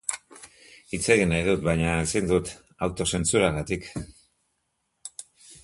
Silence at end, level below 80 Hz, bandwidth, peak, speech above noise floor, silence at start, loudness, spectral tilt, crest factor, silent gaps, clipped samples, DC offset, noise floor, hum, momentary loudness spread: 0.05 s; -44 dBFS; 11.5 kHz; -4 dBFS; 51 dB; 0.1 s; -25 LUFS; -4.5 dB/octave; 22 dB; none; under 0.1%; under 0.1%; -76 dBFS; none; 19 LU